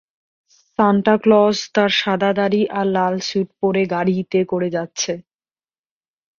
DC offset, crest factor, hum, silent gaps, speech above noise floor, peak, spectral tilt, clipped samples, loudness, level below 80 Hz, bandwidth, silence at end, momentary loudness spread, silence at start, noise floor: under 0.1%; 18 dB; none; none; over 73 dB; -2 dBFS; -5 dB/octave; under 0.1%; -18 LUFS; -60 dBFS; 7.2 kHz; 1.2 s; 9 LU; 0.8 s; under -90 dBFS